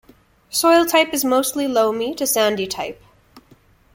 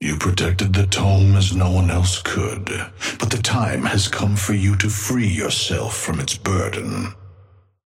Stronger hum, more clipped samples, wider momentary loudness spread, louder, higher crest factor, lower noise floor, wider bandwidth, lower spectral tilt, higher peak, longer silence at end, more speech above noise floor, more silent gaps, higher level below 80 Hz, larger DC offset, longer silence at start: neither; neither; about the same, 10 LU vs 9 LU; about the same, -18 LUFS vs -19 LUFS; about the same, 18 dB vs 16 dB; about the same, -53 dBFS vs -50 dBFS; about the same, 17 kHz vs 15.5 kHz; second, -2 dB/octave vs -4.5 dB/octave; about the same, -2 dBFS vs -4 dBFS; about the same, 0.55 s vs 0.55 s; about the same, 35 dB vs 32 dB; neither; second, -56 dBFS vs -38 dBFS; neither; first, 0.5 s vs 0 s